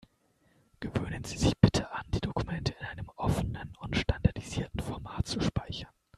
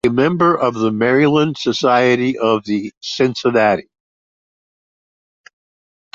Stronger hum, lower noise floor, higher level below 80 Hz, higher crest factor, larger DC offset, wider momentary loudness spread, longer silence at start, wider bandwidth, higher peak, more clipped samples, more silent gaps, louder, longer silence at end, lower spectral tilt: neither; second, -69 dBFS vs under -90 dBFS; first, -42 dBFS vs -56 dBFS; first, 28 dB vs 14 dB; neither; first, 15 LU vs 6 LU; first, 0.8 s vs 0.05 s; first, 13 kHz vs 7.8 kHz; about the same, -4 dBFS vs -2 dBFS; neither; second, none vs 2.97-3.01 s; second, -32 LUFS vs -16 LUFS; second, 0.3 s vs 2.35 s; about the same, -6 dB/octave vs -6 dB/octave